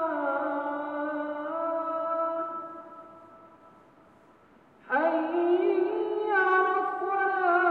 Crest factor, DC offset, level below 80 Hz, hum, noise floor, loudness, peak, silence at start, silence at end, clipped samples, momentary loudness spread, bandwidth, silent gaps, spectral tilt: 18 dB; under 0.1%; -78 dBFS; none; -58 dBFS; -28 LUFS; -12 dBFS; 0 s; 0 s; under 0.1%; 10 LU; 4.7 kHz; none; -6.5 dB/octave